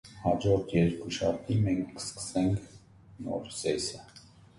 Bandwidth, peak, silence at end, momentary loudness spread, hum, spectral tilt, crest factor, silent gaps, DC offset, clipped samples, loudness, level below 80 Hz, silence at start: 11.5 kHz; -12 dBFS; 0.4 s; 10 LU; none; -6 dB/octave; 18 dB; none; under 0.1%; under 0.1%; -31 LUFS; -52 dBFS; 0.05 s